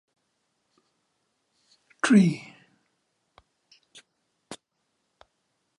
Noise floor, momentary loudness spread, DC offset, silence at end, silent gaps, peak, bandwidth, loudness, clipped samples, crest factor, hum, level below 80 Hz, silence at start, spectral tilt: -77 dBFS; 26 LU; under 0.1%; 1.25 s; none; -8 dBFS; 11 kHz; -22 LUFS; under 0.1%; 24 dB; none; -76 dBFS; 2.05 s; -6 dB/octave